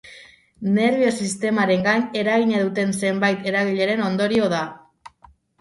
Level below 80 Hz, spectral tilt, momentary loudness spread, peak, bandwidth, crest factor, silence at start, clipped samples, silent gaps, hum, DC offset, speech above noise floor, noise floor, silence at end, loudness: -62 dBFS; -5 dB/octave; 4 LU; -6 dBFS; 11.5 kHz; 16 dB; 0.05 s; under 0.1%; none; none; under 0.1%; 33 dB; -53 dBFS; 0.85 s; -20 LUFS